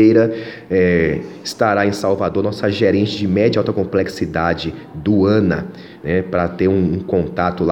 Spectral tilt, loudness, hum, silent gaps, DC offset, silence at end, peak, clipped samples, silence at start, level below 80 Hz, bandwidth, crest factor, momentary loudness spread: -7 dB/octave; -17 LUFS; none; none; under 0.1%; 0 s; 0 dBFS; under 0.1%; 0 s; -42 dBFS; 15.5 kHz; 16 dB; 9 LU